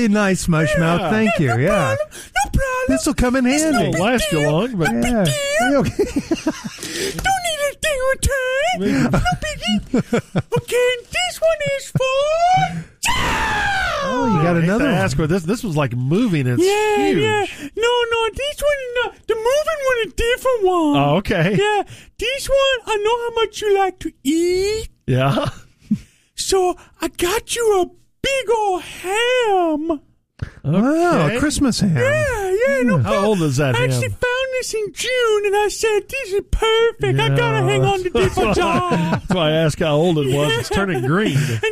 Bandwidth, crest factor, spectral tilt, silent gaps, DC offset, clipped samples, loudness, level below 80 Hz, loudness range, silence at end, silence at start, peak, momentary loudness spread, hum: 15.5 kHz; 12 dB; -5 dB/octave; none; under 0.1%; under 0.1%; -18 LUFS; -34 dBFS; 2 LU; 0 s; 0 s; -6 dBFS; 6 LU; none